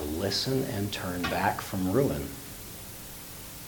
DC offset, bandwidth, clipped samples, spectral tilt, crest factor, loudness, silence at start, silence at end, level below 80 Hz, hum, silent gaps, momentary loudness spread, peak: under 0.1%; 19 kHz; under 0.1%; -4.5 dB/octave; 20 dB; -31 LUFS; 0 s; 0 s; -50 dBFS; none; none; 13 LU; -10 dBFS